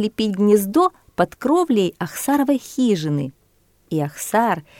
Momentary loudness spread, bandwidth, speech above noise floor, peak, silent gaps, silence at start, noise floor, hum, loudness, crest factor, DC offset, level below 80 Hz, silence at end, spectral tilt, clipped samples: 9 LU; 17.5 kHz; 40 dB; -2 dBFS; none; 0 s; -59 dBFS; none; -20 LUFS; 16 dB; under 0.1%; -58 dBFS; 0.2 s; -5.5 dB/octave; under 0.1%